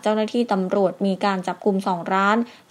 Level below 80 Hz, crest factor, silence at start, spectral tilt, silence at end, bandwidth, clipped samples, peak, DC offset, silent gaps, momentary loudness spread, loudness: -76 dBFS; 18 dB; 0.05 s; -6.5 dB/octave; 0.15 s; 12 kHz; under 0.1%; -4 dBFS; under 0.1%; none; 4 LU; -22 LUFS